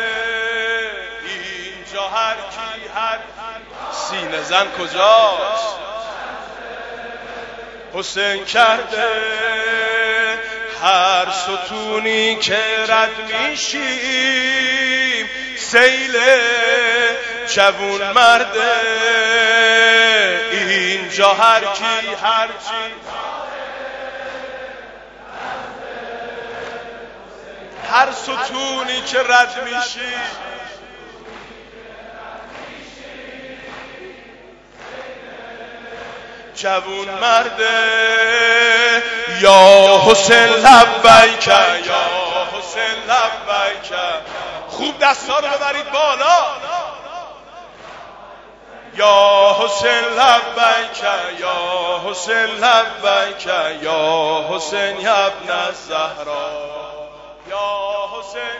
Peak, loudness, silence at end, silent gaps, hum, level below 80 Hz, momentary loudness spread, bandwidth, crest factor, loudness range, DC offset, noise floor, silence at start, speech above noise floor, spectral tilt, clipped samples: 0 dBFS; -14 LUFS; 0 s; none; none; -52 dBFS; 22 LU; 11 kHz; 16 dB; 19 LU; under 0.1%; -42 dBFS; 0 s; 27 dB; -1.5 dB/octave; 0.3%